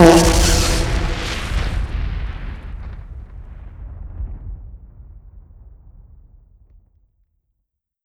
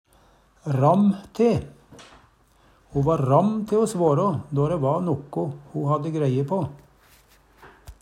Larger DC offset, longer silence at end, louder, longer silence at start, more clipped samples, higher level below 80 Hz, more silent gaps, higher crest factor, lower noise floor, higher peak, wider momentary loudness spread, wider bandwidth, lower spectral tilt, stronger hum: neither; first, 2.05 s vs 0.1 s; first, -19 LUFS vs -23 LUFS; second, 0 s vs 0.65 s; neither; first, -24 dBFS vs -54 dBFS; neither; about the same, 20 dB vs 18 dB; first, -76 dBFS vs -58 dBFS; first, 0 dBFS vs -4 dBFS; first, 24 LU vs 10 LU; first, 18.5 kHz vs 12 kHz; second, -4.5 dB/octave vs -8.5 dB/octave; neither